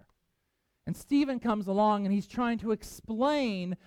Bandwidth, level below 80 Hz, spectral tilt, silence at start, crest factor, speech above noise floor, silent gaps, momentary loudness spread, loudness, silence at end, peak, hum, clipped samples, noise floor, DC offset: 15.5 kHz; -58 dBFS; -6.5 dB/octave; 0.85 s; 14 dB; 49 dB; none; 12 LU; -30 LUFS; 0.1 s; -16 dBFS; none; under 0.1%; -79 dBFS; under 0.1%